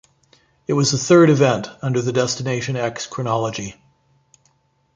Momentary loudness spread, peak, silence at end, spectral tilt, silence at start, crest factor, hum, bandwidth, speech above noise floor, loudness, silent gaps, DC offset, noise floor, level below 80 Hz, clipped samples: 13 LU; -2 dBFS; 1.25 s; -5 dB/octave; 0.7 s; 18 dB; none; 9.4 kHz; 44 dB; -18 LUFS; none; under 0.1%; -62 dBFS; -56 dBFS; under 0.1%